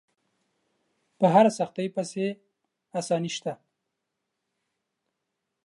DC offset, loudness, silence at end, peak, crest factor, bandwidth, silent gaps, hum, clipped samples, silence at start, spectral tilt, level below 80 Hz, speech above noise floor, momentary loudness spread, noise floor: under 0.1%; -26 LUFS; 2.1 s; -6 dBFS; 24 dB; 11.5 kHz; none; none; under 0.1%; 1.2 s; -5.5 dB/octave; -84 dBFS; 58 dB; 17 LU; -82 dBFS